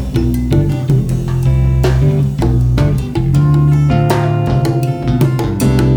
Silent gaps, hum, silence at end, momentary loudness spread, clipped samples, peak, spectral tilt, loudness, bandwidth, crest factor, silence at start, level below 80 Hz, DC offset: none; none; 0 s; 4 LU; under 0.1%; 0 dBFS; -8 dB/octave; -13 LUFS; 17.5 kHz; 12 dB; 0 s; -22 dBFS; under 0.1%